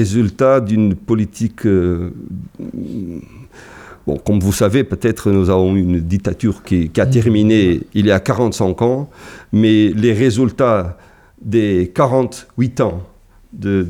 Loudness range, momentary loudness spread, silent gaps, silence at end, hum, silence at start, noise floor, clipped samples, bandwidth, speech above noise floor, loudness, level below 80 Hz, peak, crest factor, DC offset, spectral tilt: 5 LU; 14 LU; none; 0 s; none; 0 s; -38 dBFS; under 0.1%; 15.5 kHz; 23 dB; -15 LUFS; -38 dBFS; -2 dBFS; 14 dB; under 0.1%; -7 dB/octave